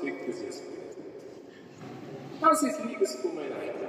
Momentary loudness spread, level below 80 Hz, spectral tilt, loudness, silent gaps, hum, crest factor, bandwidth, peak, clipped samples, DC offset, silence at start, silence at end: 22 LU; -80 dBFS; -4 dB/octave; -29 LUFS; none; none; 22 dB; 15.5 kHz; -10 dBFS; under 0.1%; under 0.1%; 0 s; 0 s